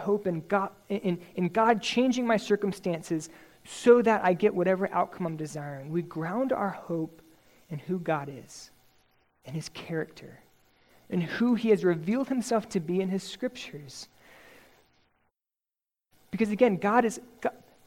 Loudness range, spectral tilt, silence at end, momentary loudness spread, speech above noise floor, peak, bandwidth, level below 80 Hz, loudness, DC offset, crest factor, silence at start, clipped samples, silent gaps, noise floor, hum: 11 LU; -6 dB/octave; 0.3 s; 16 LU; over 62 dB; -8 dBFS; 16.5 kHz; -68 dBFS; -28 LUFS; under 0.1%; 20 dB; 0 s; under 0.1%; none; under -90 dBFS; none